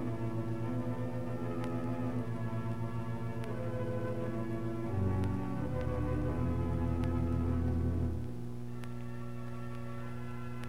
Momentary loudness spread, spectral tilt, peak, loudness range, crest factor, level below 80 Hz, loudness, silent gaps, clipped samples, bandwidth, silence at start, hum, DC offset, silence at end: 9 LU; -9 dB/octave; -22 dBFS; 3 LU; 14 dB; -48 dBFS; -37 LUFS; none; under 0.1%; 12.5 kHz; 0 s; 60 Hz at -40 dBFS; 0.9%; 0 s